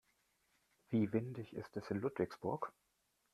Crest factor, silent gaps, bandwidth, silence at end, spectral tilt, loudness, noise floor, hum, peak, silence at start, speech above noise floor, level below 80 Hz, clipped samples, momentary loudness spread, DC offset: 20 dB; none; 13 kHz; 0.65 s; -8.5 dB/octave; -41 LUFS; -79 dBFS; none; -22 dBFS; 0.9 s; 39 dB; -76 dBFS; under 0.1%; 11 LU; under 0.1%